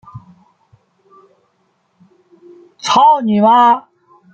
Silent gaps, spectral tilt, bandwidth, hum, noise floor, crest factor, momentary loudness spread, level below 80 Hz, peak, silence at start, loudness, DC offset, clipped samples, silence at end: none; -5 dB/octave; 8.8 kHz; none; -62 dBFS; 14 dB; 9 LU; -64 dBFS; -2 dBFS; 0.15 s; -11 LUFS; under 0.1%; under 0.1%; 0.55 s